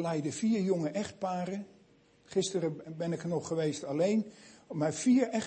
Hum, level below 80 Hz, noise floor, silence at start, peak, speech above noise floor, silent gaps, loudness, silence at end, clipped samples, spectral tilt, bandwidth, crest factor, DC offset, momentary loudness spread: none; -74 dBFS; -63 dBFS; 0 s; -16 dBFS; 32 dB; none; -32 LUFS; 0 s; under 0.1%; -5.5 dB/octave; 8.8 kHz; 16 dB; under 0.1%; 11 LU